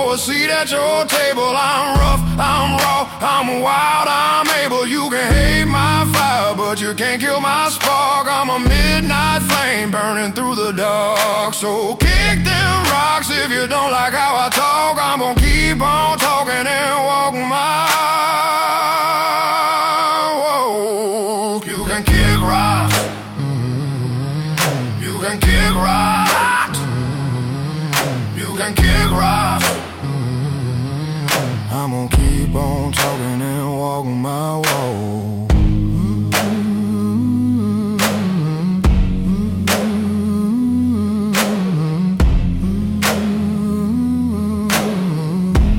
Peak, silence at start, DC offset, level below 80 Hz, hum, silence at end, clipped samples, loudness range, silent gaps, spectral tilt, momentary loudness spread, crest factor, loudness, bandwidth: -2 dBFS; 0 s; under 0.1%; -24 dBFS; none; 0 s; under 0.1%; 3 LU; none; -4.5 dB/octave; 7 LU; 14 dB; -16 LUFS; 16.5 kHz